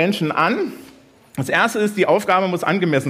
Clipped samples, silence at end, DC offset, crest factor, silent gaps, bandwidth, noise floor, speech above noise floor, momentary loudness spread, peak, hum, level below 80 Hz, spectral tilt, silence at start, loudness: under 0.1%; 0 s; under 0.1%; 16 dB; none; 16 kHz; -47 dBFS; 29 dB; 10 LU; -2 dBFS; none; -64 dBFS; -5.5 dB/octave; 0 s; -18 LUFS